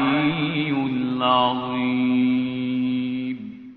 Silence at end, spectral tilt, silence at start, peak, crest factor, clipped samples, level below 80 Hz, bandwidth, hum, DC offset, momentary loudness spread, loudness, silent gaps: 0 s; -4 dB/octave; 0 s; -6 dBFS; 16 dB; under 0.1%; -60 dBFS; 4.6 kHz; none; under 0.1%; 7 LU; -22 LUFS; none